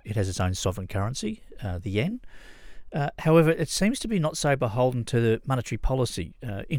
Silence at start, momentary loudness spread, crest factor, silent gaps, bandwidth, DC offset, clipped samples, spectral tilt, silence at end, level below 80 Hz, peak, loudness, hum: 0.05 s; 13 LU; 20 dB; none; 17 kHz; under 0.1%; under 0.1%; -5.5 dB/octave; 0 s; -40 dBFS; -6 dBFS; -26 LUFS; none